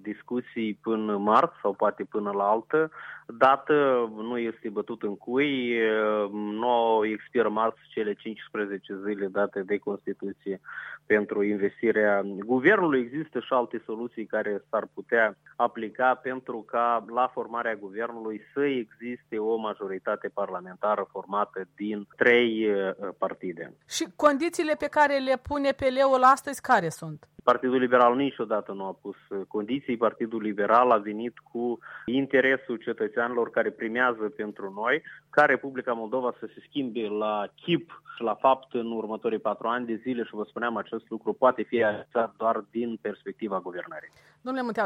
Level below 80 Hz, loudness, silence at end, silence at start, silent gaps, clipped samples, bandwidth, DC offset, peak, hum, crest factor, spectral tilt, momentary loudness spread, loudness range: -68 dBFS; -27 LUFS; 0 s; 0.05 s; none; under 0.1%; 16.5 kHz; under 0.1%; -6 dBFS; none; 20 dB; -5 dB/octave; 13 LU; 6 LU